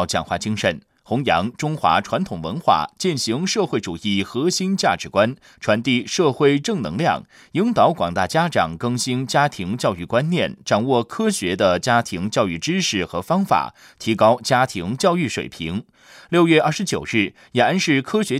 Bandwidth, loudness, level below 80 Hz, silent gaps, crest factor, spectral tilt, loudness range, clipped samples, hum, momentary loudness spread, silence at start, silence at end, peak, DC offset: 15.5 kHz; -20 LUFS; -56 dBFS; none; 16 dB; -4.5 dB/octave; 1 LU; under 0.1%; none; 7 LU; 0 s; 0 s; -4 dBFS; under 0.1%